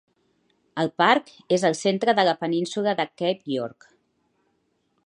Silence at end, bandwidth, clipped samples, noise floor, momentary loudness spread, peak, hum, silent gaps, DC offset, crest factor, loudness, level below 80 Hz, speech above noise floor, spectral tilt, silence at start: 1.35 s; 11 kHz; under 0.1%; -71 dBFS; 9 LU; -4 dBFS; none; none; under 0.1%; 22 dB; -23 LUFS; -76 dBFS; 48 dB; -4.5 dB/octave; 0.75 s